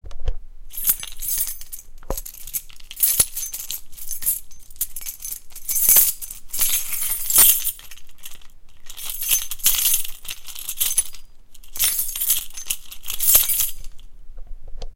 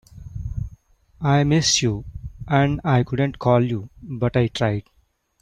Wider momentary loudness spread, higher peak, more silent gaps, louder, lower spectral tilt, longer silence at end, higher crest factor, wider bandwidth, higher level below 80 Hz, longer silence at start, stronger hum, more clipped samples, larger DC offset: first, 20 LU vs 17 LU; first, 0 dBFS vs -4 dBFS; neither; about the same, -19 LUFS vs -21 LUFS; second, 1 dB/octave vs -5 dB/octave; second, 0 s vs 0.6 s; about the same, 22 dB vs 18 dB; first, 17 kHz vs 9.8 kHz; about the same, -38 dBFS vs -40 dBFS; about the same, 0.05 s vs 0.15 s; neither; neither; neither